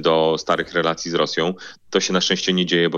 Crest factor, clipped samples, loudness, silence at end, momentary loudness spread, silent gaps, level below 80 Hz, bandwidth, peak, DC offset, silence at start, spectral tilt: 16 dB; under 0.1%; -20 LUFS; 0 s; 6 LU; none; -60 dBFS; 7.8 kHz; -4 dBFS; under 0.1%; 0 s; -4 dB/octave